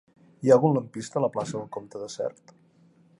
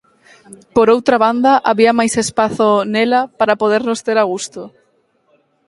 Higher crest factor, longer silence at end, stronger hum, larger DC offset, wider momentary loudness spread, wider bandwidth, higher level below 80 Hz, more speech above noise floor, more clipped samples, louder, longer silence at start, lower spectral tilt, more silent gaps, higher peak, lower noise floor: first, 20 dB vs 14 dB; about the same, 0.9 s vs 1 s; neither; neither; first, 17 LU vs 7 LU; about the same, 11 kHz vs 11.5 kHz; second, -72 dBFS vs -54 dBFS; second, 34 dB vs 45 dB; neither; second, -26 LUFS vs -14 LUFS; about the same, 0.4 s vs 0.5 s; first, -7 dB/octave vs -4 dB/octave; neither; second, -6 dBFS vs 0 dBFS; about the same, -59 dBFS vs -59 dBFS